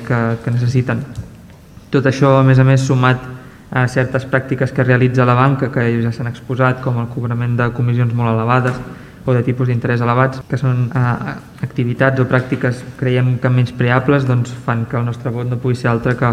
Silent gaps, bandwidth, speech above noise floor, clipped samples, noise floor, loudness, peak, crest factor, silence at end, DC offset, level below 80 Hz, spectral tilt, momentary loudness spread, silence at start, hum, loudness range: none; 9.2 kHz; 24 dB; under 0.1%; -39 dBFS; -16 LUFS; 0 dBFS; 16 dB; 0 s; under 0.1%; -44 dBFS; -8 dB/octave; 9 LU; 0 s; none; 3 LU